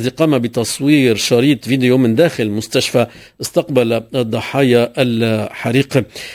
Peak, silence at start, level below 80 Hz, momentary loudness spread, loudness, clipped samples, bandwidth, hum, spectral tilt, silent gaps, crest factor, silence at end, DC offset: 0 dBFS; 0 s; -50 dBFS; 7 LU; -15 LUFS; under 0.1%; 16 kHz; none; -5.5 dB/octave; none; 14 dB; 0 s; under 0.1%